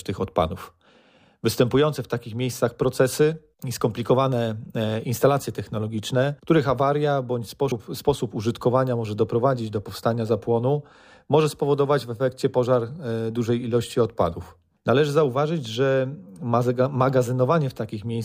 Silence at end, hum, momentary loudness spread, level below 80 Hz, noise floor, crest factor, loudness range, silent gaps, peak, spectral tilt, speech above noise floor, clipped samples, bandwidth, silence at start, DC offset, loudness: 0 s; none; 8 LU; -54 dBFS; -57 dBFS; 18 dB; 1 LU; none; -6 dBFS; -6.5 dB/octave; 34 dB; under 0.1%; 15.5 kHz; 0.05 s; under 0.1%; -23 LUFS